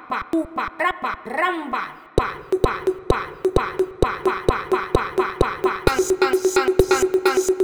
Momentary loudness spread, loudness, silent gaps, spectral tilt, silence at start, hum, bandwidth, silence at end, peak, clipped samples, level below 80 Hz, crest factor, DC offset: 7 LU; -21 LUFS; none; -5 dB/octave; 0 s; none; over 20 kHz; 0 s; 0 dBFS; under 0.1%; -34 dBFS; 20 dB; under 0.1%